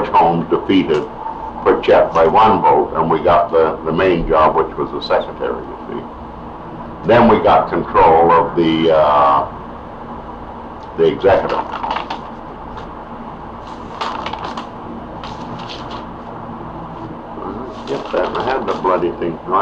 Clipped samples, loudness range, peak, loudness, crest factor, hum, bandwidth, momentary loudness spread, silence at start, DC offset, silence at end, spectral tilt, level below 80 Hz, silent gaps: under 0.1%; 14 LU; -2 dBFS; -15 LUFS; 14 dB; none; 7.8 kHz; 20 LU; 0 s; under 0.1%; 0 s; -7 dB/octave; -38 dBFS; none